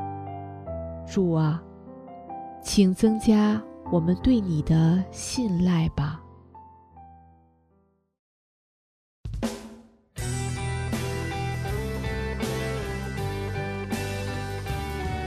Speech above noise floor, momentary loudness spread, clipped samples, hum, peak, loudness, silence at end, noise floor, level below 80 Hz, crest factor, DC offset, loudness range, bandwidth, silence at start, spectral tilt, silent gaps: 44 dB; 18 LU; under 0.1%; none; -8 dBFS; -26 LUFS; 0 s; -66 dBFS; -42 dBFS; 20 dB; under 0.1%; 15 LU; 14 kHz; 0 s; -6.5 dB/octave; 8.19-9.24 s